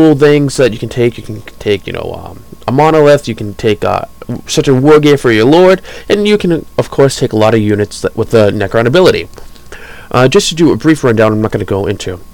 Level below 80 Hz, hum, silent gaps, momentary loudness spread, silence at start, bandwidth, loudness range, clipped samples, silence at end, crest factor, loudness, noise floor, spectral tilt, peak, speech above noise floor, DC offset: -34 dBFS; none; none; 14 LU; 0 s; 18 kHz; 4 LU; under 0.1%; 0.15 s; 10 dB; -10 LUFS; -30 dBFS; -6 dB/octave; 0 dBFS; 21 dB; 2%